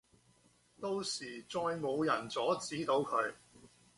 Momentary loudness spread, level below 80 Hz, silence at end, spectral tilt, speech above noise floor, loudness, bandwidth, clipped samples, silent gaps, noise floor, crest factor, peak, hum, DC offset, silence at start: 8 LU; -74 dBFS; 0.3 s; -4 dB/octave; 33 dB; -36 LUFS; 11.5 kHz; under 0.1%; none; -69 dBFS; 18 dB; -20 dBFS; 60 Hz at -65 dBFS; under 0.1%; 0.8 s